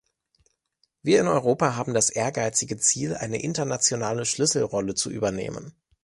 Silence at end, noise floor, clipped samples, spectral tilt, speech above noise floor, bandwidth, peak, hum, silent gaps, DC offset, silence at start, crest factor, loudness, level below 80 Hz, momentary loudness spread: 0.35 s; -72 dBFS; under 0.1%; -3.5 dB/octave; 47 dB; 11.5 kHz; -6 dBFS; none; none; under 0.1%; 1.05 s; 18 dB; -24 LUFS; -58 dBFS; 7 LU